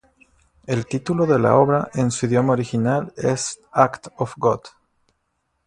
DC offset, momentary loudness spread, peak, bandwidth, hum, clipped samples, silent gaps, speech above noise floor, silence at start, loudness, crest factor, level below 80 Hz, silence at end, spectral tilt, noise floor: under 0.1%; 10 LU; 0 dBFS; 11 kHz; none; under 0.1%; none; 52 dB; 0.7 s; -20 LUFS; 22 dB; -56 dBFS; 1 s; -6 dB/octave; -72 dBFS